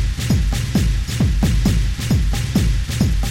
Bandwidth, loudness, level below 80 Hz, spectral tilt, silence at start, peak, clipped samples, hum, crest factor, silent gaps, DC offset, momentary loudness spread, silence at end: 16.5 kHz; -19 LUFS; -20 dBFS; -5.5 dB/octave; 0 s; -4 dBFS; under 0.1%; none; 14 dB; none; under 0.1%; 2 LU; 0 s